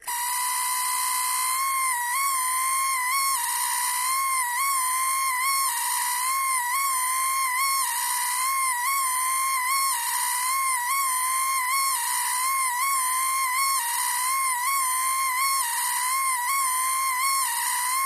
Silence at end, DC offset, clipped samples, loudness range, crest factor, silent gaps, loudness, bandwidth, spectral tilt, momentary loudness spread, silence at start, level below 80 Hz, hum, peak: 0 s; under 0.1%; under 0.1%; 0 LU; 12 dB; none; -23 LUFS; 15.5 kHz; 6 dB/octave; 1 LU; 0 s; -74 dBFS; none; -12 dBFS